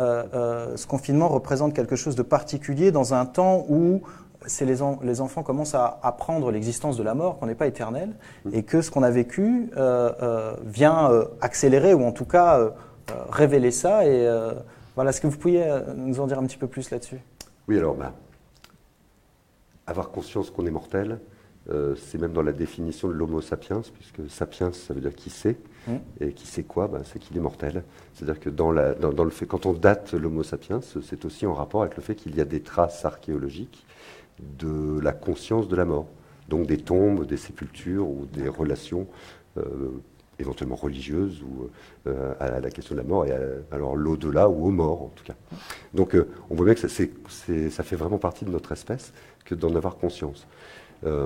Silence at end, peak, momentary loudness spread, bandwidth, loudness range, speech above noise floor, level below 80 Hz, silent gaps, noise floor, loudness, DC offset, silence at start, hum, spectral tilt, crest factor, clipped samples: 0 s; -2 dBFS; 15 LU; 15.5 kHz; 11 LU; 36 dB; -46 dBFS; none; -60 dBFS; -25 LUFS; under 0.1%; 0 s; none; -6.5 dB/octave; 22 dB; under 0.1%